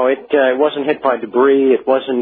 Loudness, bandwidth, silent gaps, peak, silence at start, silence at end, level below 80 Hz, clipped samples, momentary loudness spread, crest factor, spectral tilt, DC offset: -14 LUFS; 4.2 kHz; none; 0 dBFS; 0 s; 0 s; -64 dBFS; under 0.1%; 5 LU; 14 dB; -9 dB/octave; under 0.1%